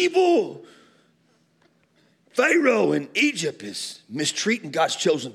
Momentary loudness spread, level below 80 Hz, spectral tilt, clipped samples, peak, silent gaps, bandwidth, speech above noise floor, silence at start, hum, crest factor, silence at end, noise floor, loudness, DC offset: 13 LU; -82 dBFS; -3.5 dB/octave; under 0.1%; -6 dBFS; none; 14 kHz; 41 dB; 0 s; none; 18 dB; 0 s; -64 dBFS; -22 LUFS; under 0.1%